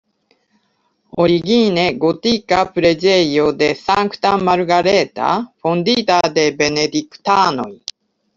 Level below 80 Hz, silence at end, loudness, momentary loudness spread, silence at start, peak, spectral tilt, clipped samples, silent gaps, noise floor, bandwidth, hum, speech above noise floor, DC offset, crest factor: -50 dBFS; 0.6 s; -15 LUFS; 6 LU; 1.15 s; 0 dBFS; -4.5 dB/octave; under 0.1%; none; -64 dBFS; 7.6 kHz; none; 49 dB; under 0.1%; 16 dB